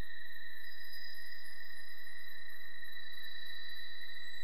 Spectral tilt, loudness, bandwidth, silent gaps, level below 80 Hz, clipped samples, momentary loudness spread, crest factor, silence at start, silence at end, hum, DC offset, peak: -2 dB/octave; -48 LUFS; 14 kHz; none; -80 dBFS; under 0.1%; 4 LU; 12 dB; 0 s; 0 s; none; 3%; -26 dBFS